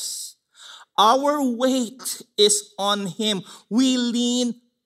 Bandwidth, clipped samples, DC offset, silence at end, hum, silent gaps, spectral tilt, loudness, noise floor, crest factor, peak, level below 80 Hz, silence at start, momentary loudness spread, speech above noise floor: 15.5 kHz; under 0.1%; under 0.1%; 0.3 s; none; none; -2.5 dB/octave; -21 LUFS; -46 dBFS; 18 dB; -4 dBFS; -80 dBFS; 0 s; 11 LU; 25 dB